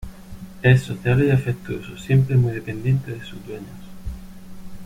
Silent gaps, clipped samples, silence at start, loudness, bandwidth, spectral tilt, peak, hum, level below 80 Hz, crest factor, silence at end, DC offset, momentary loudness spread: none; under 0.1%; 0 s; -20 LUFS; 11.5 kHz; -8 dB/octave; -2 dBFS; none; -42 dBFS; 18 dB; 0 s; under 0.1%; 22 LU